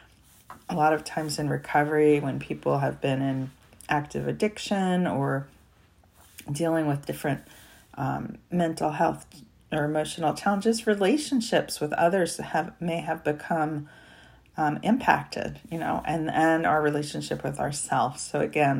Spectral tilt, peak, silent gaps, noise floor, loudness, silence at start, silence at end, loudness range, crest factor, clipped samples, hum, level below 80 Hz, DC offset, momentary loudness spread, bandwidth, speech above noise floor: -5.5 dB/octave; -6 dBFS; none; -59 dBFS; -27 LUFS; 0.5 s; 0 s; 4 LU; 22 dB; under 0.1%; none; -58 dBFS; under 0.1%; 10 LU; 16 kHz; 33 dB